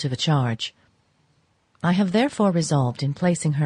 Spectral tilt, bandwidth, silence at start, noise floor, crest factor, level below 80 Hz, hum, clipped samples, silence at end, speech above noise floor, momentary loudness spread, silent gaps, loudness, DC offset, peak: -6 dB/octave; 11 kHz; 0 s; -65 dBFS; 16 dB; -60 dBFS; none; under 0.1%; 0 s; 43 dB; 7 LU; none; -22 LUFS; under 0.1%; -8 dBFS